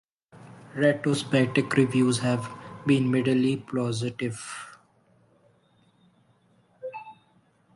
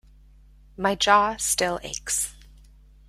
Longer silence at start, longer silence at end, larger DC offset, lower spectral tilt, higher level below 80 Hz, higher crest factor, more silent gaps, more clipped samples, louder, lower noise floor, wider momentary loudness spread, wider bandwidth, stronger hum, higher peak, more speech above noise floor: second, 0.35 s vs 0.8 s; about the same, 0.65 s vs 0.75 s; neither; first, -6 dB/octave vs -1.5 dB/octave; second, -66 dBFS vs -50 dBFS; about the same, 20 dB vs 22 dB; neither; neither; about the same, -25 LUFS vs -23 LUFS; first, -64 dBFS vs -52 dBFS; first, 17 LU vs 10 LU; second, 11.5 kHz vs 16 kHz; neither; second, -8 dBFS vs -4 dBFS; first, 39 dB vs 28 dB